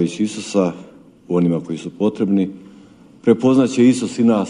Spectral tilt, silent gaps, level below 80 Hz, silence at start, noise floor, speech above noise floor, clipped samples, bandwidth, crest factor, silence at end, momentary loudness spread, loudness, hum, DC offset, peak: -6.5 dB/octave; none; -60 dBFS; 0 s; -44 dBFS; 28 dB; under 0.1%; 11 kHz; 18 dB; 0 s; 9 LU; -18 LUFS; none; under 0.1%; 0 dBFS